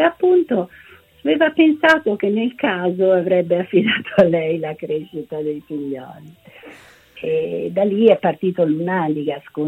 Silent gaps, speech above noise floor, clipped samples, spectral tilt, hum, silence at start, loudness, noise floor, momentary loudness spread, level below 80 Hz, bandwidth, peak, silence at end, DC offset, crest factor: none; 26 dB; under 0.1%; -7.5 dB/octave; none; 0 s; -18 LUFS; -44 dBFS; 13 LU; -62 dBFS; 8.2 kHz; 0 dBFS; 0 s; under 0.1%; 18 dB